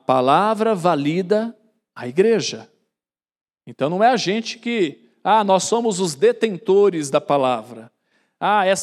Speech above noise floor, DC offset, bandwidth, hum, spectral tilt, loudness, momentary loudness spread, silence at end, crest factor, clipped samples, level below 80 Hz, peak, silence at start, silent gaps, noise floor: 71 dB; under 0.1%; 13 kHz; none; -4.5 dB/octave; -19 LUFS; 10 LU; 0 s; 16 dB; under 0.1%; -80 dBFS; -2 dBFS; 0.1 s; none; -89 dBFS